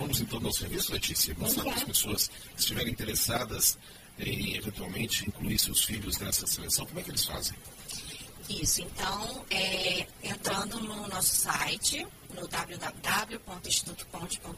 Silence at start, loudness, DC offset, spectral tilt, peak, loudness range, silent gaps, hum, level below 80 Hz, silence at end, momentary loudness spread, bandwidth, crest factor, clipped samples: 0 s; -30 LUFS; under 0.1%; -2 dB/octave; -12 dBFS; 3 LU; none; none; -48 dBFS; 0 s; 13 LU; 15.5 kHz; 20 dB; under 0.1%